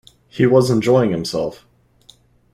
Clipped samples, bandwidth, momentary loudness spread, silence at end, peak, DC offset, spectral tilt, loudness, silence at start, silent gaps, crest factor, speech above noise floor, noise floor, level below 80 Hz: under 0.1%; 14.5 kHz; 12 LU; 1 s; -2 dBFS; under 0.1%; -6.5 dB/octave; -17 LUFS; 0.35 s; none; 16 dB; 36 dB; -51 dBFS; -52 dBFS